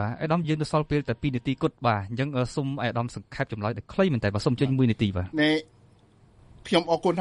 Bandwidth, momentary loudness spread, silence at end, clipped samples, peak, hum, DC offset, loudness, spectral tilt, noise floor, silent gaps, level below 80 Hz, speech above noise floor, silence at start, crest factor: 11.5 kHz; 7 LU; 0 s; under 0.1%; -6 dBFS; none; under 0.1%; -26 LUFS; -7 dB/octave; -57 dBFS; none; -52 dBFS; 32 dB; 0 s; 20 dB